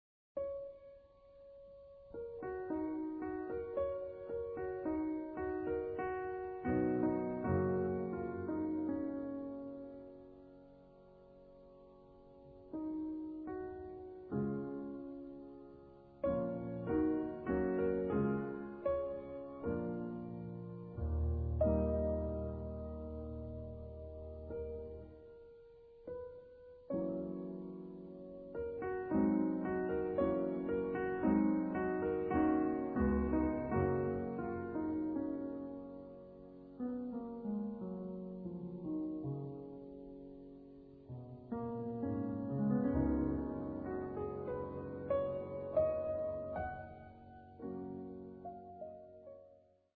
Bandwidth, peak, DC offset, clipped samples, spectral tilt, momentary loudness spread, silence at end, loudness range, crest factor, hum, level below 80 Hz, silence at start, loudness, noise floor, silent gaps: 4.5 kHz; -22 dBFS; under 0.1%; under 0.1%; -9.5 dB/octave; 20 LU; 0.4 s; 11 LU; 18 dB; none; -52 dBFS; 0.35 s; -39 LUFS; -66 dBFS; none